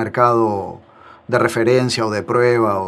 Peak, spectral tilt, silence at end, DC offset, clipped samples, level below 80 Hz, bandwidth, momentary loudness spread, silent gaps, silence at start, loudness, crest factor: 0 dBFS; -5.5 dB/octave; 0 s; under 0.1%; under 0.1%; -58 dBFS; 13.5 kHz; 7 LU; none; 0 s; -17 LUFS; 16 dB